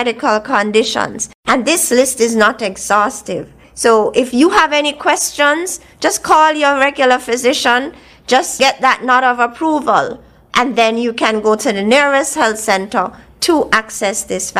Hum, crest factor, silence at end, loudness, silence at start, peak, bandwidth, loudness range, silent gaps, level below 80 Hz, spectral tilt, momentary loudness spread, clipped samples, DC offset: none; 14 dB; 0 s; -13 LUFS; 0 s; 0 dBFS; 16 kHz; 2 LU; 1.35-1.43 s; -50 dBFS; -2 dB/octave; 7 LU; under 0.1%; under 0.1%